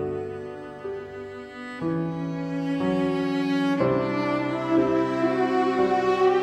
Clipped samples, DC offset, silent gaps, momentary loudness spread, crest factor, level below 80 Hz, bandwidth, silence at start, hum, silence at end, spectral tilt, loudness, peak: under 0.1%; under 0.1%; none; 14 LU; 16 dB; -58 dBFS; 9 kHz; 0 s; none; 0 s; -7.5 dB/octave; -25 LUFS; -10 dBFS